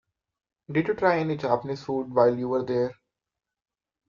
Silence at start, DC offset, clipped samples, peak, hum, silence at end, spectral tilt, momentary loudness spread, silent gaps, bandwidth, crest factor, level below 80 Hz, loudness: 0.7 s; under 0.1%; under 0.1%; -6 dBFS; none; 1.15 s; -8 dB/octave; 8 LU; none; 7.2 kHz; 22 dB; -64 dBFS; -26 LUFS